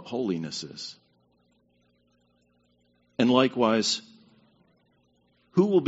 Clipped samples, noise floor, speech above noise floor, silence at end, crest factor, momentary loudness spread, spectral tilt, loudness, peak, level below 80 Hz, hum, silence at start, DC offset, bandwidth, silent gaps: under 0.1%; -68 dBFS; 43 dB; 0 s; 24 dB; 17 LU; -4.5 dB/octave; -26 LUFS; -6 dBFS; -70 dBFS; 60 Hz at -55 dBFS; 0 s; under 0.1%; 8 kHz; none